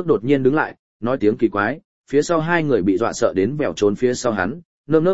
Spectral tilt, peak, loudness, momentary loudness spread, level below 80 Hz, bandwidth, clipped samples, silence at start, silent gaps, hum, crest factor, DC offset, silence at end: -6 dB/octave; -2 dBFS; -19 LUFS; 8 LU; -52 dBFS; 8 kHz; under 0.1%; 0 s; 0.79-1.00 s, 1.84-2.04 s, 4.65-4.84 s; none; 18 dB; 0.8%; 0 s